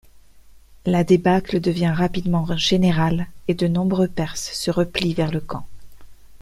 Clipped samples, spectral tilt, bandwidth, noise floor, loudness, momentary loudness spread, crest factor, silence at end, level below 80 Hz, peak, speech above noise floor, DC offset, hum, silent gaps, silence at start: under 0.1%; -6 dB/octave; 13.5 kHz; -46 dBFS; -21 LUFS; 9 LU; 18 dB; 0.05 s; -42 dBFS; -4 dBFS; 26 dB; under 0.1%; none; none; 0.15 s